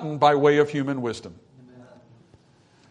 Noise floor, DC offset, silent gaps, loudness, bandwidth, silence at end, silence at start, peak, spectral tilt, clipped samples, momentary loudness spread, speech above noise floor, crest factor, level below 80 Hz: -57 dBFS; under 0.1%; none; -21 LUFS; 10.5 kHz; 1.05 s; 0 s; -4 dBFS; -6.5 dB/octave; under 0.1%; 18 LU; 36 dB; 20 dB; -66 dBFS